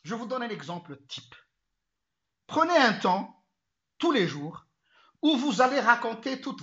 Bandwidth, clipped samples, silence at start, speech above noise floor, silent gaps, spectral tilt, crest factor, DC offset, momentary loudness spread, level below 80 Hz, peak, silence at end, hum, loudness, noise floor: 8 kHz; under 0.1%; 0.05 s; 59 dB; none; -4.5 dB/octave; 24 dB; under 0.1%; 19 LU; -78 dBFS; -6 dBFS; 0 s; none; -26 LUFS; -85 dBFS